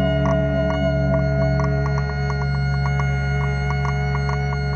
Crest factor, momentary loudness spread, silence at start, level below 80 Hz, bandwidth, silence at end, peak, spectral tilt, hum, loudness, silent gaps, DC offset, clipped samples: 12 dB; 3 LU; 0 s; -28 dBFS; 6.8 kHz; 0 s; -8 dBFS; -8 dB/octave; none; -21 LUFS; none; under 0.1%; under 0.1%